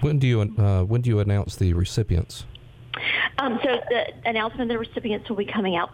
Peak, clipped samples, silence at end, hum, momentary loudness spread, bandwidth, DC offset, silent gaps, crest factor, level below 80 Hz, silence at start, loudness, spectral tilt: -8 dBFS; under 0.1%; 0 s; none; 7 LU; 13 kHz; under 0.1%; none; 14 dB; -42 dBFS; 0 s; -24 LUFS; -6.5 dB/octave